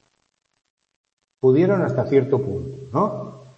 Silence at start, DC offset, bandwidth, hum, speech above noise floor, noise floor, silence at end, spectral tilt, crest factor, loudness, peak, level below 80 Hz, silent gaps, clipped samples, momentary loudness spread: 1.45 s; under 0.1%; 7 kHz; none; 52 dB; -71 dBFS; 0.2 s; -9.5 dB/octave; 18 dB; -21 LUFS; -4 dBFS; -58 dBFS; none; under 0.1%; 11 LU